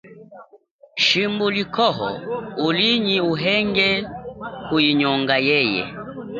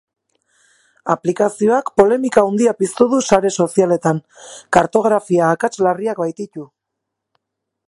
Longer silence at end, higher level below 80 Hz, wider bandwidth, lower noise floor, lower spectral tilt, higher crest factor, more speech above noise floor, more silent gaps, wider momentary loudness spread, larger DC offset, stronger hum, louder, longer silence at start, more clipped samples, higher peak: second, 0 s vs 1.25 s; about the same, -54 dBFS vs -54 dBFS; second, 7.6 kHz vs 11.5 kHz; second, -52 dBFS vs -79 dBFS; about the same, -5 dB/octave vs -5.5 dB/octave; about the same, 18 dB vs 18 dB; second, 32 dB vs 63 dB; first, 0.71-0.79 s vs none; first, 15 LU vs 12 LU; neither; neither; second, -19 LUFS vs -16 LUFS; second, 0.05 s vs 1.05 s; neither; about the same, -2 dBFS vs 0 dBFS